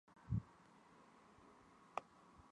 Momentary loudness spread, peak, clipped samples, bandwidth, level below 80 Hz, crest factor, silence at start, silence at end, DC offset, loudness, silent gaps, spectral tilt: 20 LU; -24 dBFS; under 0.1%; 10.5 kHz; -64 dBFS; 28 dB; 0.05 s; 0 s; under 0.1%; -49 LUFS; none; -8 dB/octave